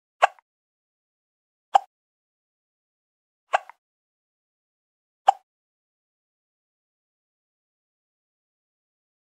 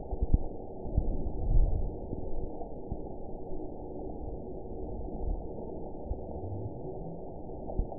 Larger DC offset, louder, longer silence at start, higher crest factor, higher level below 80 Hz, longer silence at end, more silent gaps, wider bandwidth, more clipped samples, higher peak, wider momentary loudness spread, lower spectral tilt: second, under 0.1% vs 0.6%; first, -25 LUFS vs -38 LUFS; first, 0.2 s vs 0 s; first, 30 dB vs 22 dB; second, under -90 dBFS vs -34 dBFS; first, 4.05 s vs 0 s; first, 0.42-1.72 s, 1.87-3.47 s, 3.78-5.25 s vs none; first, 9.6 kHz vs 1 kHz; neither; first, -2 dBFS vs -10 dBFS; second, 4 LU vs 10 LU; second, 2 dB/octave vs -16 dB/octave